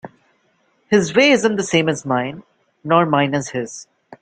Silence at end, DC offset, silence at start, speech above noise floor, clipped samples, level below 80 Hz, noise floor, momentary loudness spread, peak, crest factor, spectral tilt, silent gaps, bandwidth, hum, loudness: 0.05 s; under 0.1%; 0.05 s; 45 dB; under 0.1%; -60 dBFS; -62 dBFS; 15 LU; -2 dBFS; 18 dB; -4.5 dB/octave; none; 9.4 kHz; none; -17 LUFS